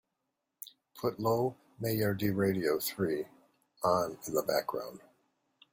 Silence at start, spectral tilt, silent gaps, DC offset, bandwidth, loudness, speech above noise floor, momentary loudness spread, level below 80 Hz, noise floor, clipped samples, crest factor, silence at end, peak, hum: 0.6 s; -5.5 dB/octave; none; under 0.1%; 16.5 kHz; -33 LUFS; 53 dB; 16 LU; -68 dBFS; -85 dBFS; under 0.1%; 18 dB; 0.75 s; -16 dBFS; none